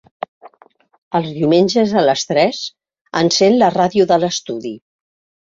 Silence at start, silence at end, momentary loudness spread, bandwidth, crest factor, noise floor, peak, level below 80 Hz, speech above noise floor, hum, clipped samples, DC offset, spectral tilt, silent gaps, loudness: 0.45 s; 0.65 s; 17 LU; 7.8 kHz; 16 dB; -52 dBFS; -2 dBFS; -58 dBFS; 37 dB; none; under 0.1%; under 0.1%; -4.5 dB/octave; 0.98-1.11 s; -15 LUFS